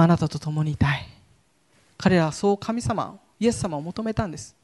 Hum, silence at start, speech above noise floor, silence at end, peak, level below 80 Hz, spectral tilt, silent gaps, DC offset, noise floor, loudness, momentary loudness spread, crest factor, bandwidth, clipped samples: none; 0 s; 39 dB; 0.15 s; -6 dBFS; -46 dBFS; -6.5 dB/octave; none; under 0.1%; -62 dBFS; -25 LUFS; 9 LU; 18 dB; 11.5 kHz; under 0.1%